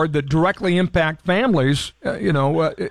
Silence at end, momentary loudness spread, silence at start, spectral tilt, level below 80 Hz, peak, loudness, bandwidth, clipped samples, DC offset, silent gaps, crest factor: 0 s; 4 LU; 0 s; -6.5 dB/octave; -42 dBFS; -8 dBFS; -19 LUFS; 12.5 kHz; under 0.1%; 0.6%; none; 12 dB